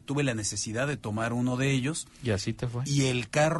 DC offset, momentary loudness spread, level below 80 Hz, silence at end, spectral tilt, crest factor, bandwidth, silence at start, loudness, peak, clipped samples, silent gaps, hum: under 0.1%; 6 LU; -54 dBFS; 0 s; -5 dB/octave; 16 dB; 11.5 kHz; 0.1 s; -29 LUFS; -12 dBFS; under 0.1%; none; none